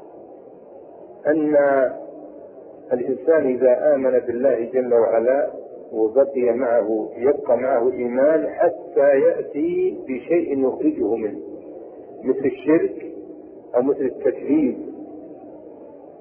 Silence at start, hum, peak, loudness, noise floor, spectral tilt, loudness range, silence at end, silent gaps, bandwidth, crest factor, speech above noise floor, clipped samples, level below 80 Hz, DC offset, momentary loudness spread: 0 s; none; -6 dBFS; -20 LUFS; -42 dBFS; -11.5 dB/octave; 4 LU; 0.1 s; none; 3.3 kHz; 16 dB; 23 dB; under 0.1%; -64 dBFS; under 0.1%; 21 LU